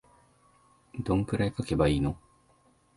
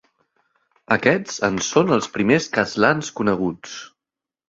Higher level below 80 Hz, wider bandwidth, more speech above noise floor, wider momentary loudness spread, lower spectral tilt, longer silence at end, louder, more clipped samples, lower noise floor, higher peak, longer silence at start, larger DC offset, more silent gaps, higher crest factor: first, -44 dBFS vs -56 dBFS; first, 11.5 kHz vs 8 kHz; second, 37 dB vs 68 dB; first, 15 LU vs 8 LU; first, -7.5 dB/octave vs -4.5 dB/octave; first, 0.8 s vs 0.65 s; second, -29 LUFS vs -20 LUFS; neither; second, -65 dBFS vs -88 dBFS; second, -12 dBFS vs -2 dBFS; about the same, 0.95 s vs 0.9 s; neither; neither; about the same, 18 dB vs 20 dB